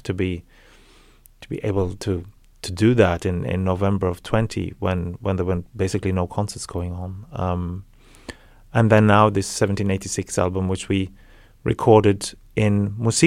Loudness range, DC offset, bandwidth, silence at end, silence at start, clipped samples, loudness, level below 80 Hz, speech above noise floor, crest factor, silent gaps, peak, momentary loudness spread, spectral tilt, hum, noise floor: 5 LU; under 0.1%; 14.5 kHz; 0 s; 0.05 s; under 0.1%; -22 LUFS; -44 dBFS; 30 dB; 20 dB; none; -2 dBFS; 16 LU; -6 dB/octave; none; -51 dBFS